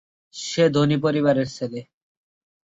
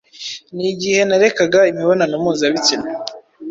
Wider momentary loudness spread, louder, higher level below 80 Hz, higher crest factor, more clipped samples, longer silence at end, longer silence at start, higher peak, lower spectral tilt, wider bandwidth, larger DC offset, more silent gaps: about the same, 16 LU vs 15 LU; second, -21 LUFS vs -15 LUFS; about the same, -60 dBFS vs -58 dBFS; about the same, 18 dB vs 16 dB; neither; first, 0.95 s vs 0 s; first, 0.35 s vs 0.15 s; second, -6 dBFS vs -2 dBFS; first, -6 dB/octave vs -3.5 dB/octave; about the same, 8 kHz vs 7.8 kHz; neither; neither